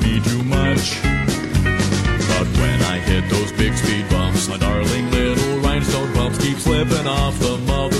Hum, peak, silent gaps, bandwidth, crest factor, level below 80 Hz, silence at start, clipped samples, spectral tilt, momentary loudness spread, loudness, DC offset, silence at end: none; -4 dBFS; none; 15.5 kHz; 14 dB; -26 dBFS; 0 s; under 0.1%; -5 dB/octave; 2 LU; -18 LUFS; under 0.1%; 0 s